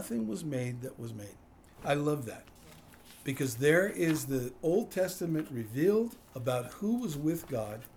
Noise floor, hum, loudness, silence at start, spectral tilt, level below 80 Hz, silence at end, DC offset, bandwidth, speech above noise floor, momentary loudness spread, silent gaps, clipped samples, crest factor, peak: -55 dBFS; none; -32 LUFS; 0 s; -6 dB/octave; -62 dBFS; 0 s; under 0.1%; over 20 kHz; 22 dB; 14 LU; none; under 0.1%; 20 dB; -12 dBFS